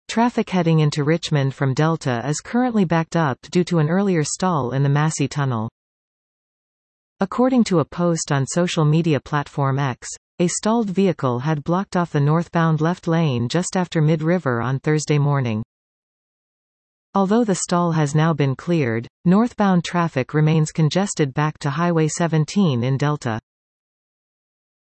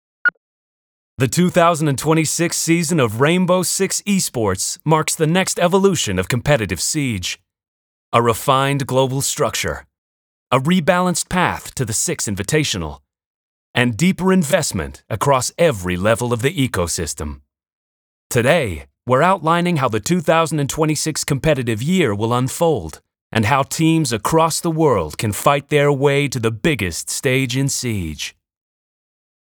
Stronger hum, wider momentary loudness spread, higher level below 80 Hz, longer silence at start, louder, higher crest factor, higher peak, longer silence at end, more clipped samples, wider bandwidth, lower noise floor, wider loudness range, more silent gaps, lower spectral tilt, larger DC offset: neither; about the same, 5 LU vs 7 LU; second, -58 dBFS vs -44 dBFS; second, 0.1 s vs 0.25 s; about the same, -20 LUFS vs -18 LUFS; about the same, 14 dB vs 18 dB; second, -6 dBFS vs 0 dBFS; first, 1.5 s vs 1.1 s; neither; second, 8.8 kHz vs over 20 kHz; about the same, under -90 dBFS vs under -90 dBFS; about the same, 3 LU vs 3 LU; first, 5.72-7.16 s, 10.17-10.38 s, 15.65-17.13 s, 19.10-19.24 s vs 0.37-1.17 s, 7.68-8.12 s, 9.98-10.47 s, 13.26-13.74 s, 17.73-18.30 s, 23.21-23.30 s; first, -6 dB/octave vs -4.5 dB/octave; neither